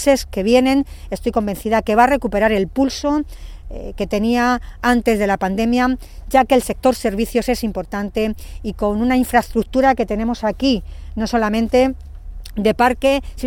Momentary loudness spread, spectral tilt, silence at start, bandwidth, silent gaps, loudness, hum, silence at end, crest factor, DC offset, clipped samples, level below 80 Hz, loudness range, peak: 12 LU; -5 dB/octave; 0 s; 18 kHz; none; -18 LUFS; none; 0 s; 16 dB; under 0.1%; under 0.1%; -34 dBFS; 2 LU; 0 dBFS